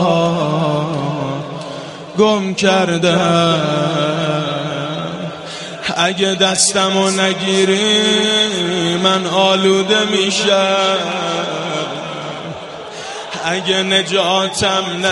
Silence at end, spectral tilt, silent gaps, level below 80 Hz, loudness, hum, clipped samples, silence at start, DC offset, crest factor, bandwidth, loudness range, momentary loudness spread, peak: 0 s; -3.5 dB/octave; none; -54 dBFS; -15 LUFS; none; under 0.1%; 0 s; under 0.1%; 16 dB; 11.5 kHz; 5 LU; 14 LU; 0 dBFS